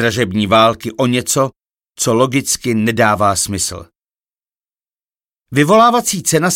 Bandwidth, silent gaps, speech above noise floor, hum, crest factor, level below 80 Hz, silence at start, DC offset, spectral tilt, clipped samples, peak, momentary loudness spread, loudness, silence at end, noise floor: 17 kHz; none; over 76 dB; none; 16 dB; -48 dBFS; 0 s; under 0.1%; -4 dB/octave; under 0.1%; 0 dBFS; 9 LU; -14 LUFS; 0 s; under -90 dBFS